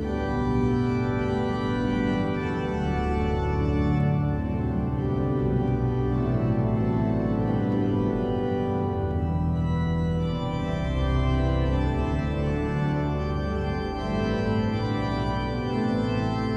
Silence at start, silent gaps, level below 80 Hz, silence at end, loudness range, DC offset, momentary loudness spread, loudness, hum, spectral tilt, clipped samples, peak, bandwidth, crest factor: 0 s; none; -34 dBFS; 0 s; 2 LU; under 0.1%; 3 LU; -26 LUFS; none; -8.5 dB/octave; under 0.1%; -12 dBFS; 8.4 kHz; 12 dB